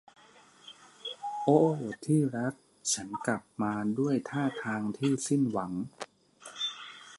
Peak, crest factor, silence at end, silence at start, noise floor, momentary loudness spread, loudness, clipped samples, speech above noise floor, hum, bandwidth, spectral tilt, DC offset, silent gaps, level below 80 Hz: -10 dBFS; 22 dB; 0 s; 0.65 s; -58 dBFS; 19 LU; -31 LUFS; under 0.1%; 29 dB; none; 11.5 kHz; -5 dB/octave; under 0.1%; none; -72 dBFS